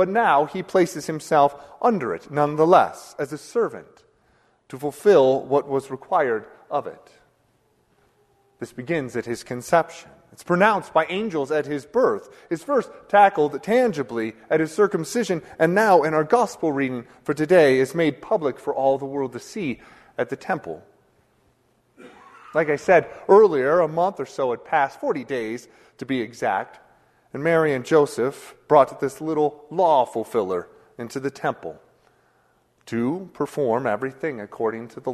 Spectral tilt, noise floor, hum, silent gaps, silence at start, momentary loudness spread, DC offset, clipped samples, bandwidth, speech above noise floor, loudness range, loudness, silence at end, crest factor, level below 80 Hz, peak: -6 dB/octave; -64 dBFS; none; none; 0 s; 14 LU; under 0.1%; under 0.1%; 13.5 kHz; 43 dB; 8 LU; -22 LUFS; 0 s; 22 dB; -64 dBFS; 0 dBFS